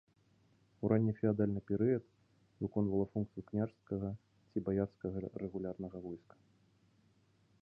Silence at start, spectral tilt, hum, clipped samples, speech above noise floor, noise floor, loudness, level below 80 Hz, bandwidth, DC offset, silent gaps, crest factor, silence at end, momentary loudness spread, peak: 0.8 s; -12 dB/octave; none; under 0.1%; 35 dB; -71 dBFS; -38 LUFS; -62 dBFS; 4.9 kHz; under 0.1%; none; 20 dB; 1.45 s; 11 LU; -18 dBFS